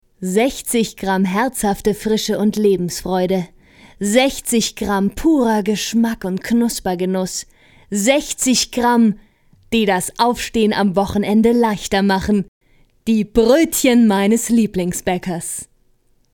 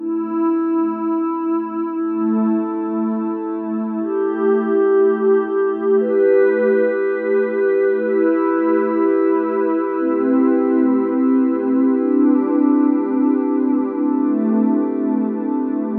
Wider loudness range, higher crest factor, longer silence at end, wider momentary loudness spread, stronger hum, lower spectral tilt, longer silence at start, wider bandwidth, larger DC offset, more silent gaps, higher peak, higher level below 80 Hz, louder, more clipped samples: about the same, 3 LU vs 4 LU; about the same, 16 dB vs 12 dB; first, 0.7 s vs 0 s; about the same, 8 LU vs 6 LU; neither; second, -4.5 dB/octave vs -11.5 dB/octave; first, 0.2 s vs 0 s; first, 19 kHz vs 3.3 kHz; neither; first, 12.48-12.61 s vs none; first, 0 dBFS vs -6 dBFS; first, -42 dBFS vs -82 dBFS; about the same, -17 LUFS vs -18 LUFS; neither